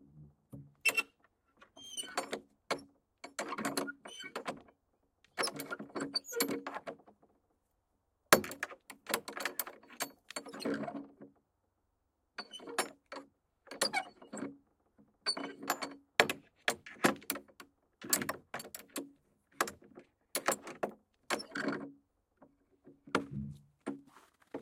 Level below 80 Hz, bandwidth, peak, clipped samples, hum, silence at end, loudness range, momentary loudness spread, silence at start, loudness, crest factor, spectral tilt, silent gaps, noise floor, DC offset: -74 dBFS; 16.5 kHz; -4 dBFS; under 0.1%; none; 0 s; 7 LU; 19 LU; 0.15 s; -37 LUFS; 36 dB; -2 dB/octave; none; -81 dBFS; under 0.1%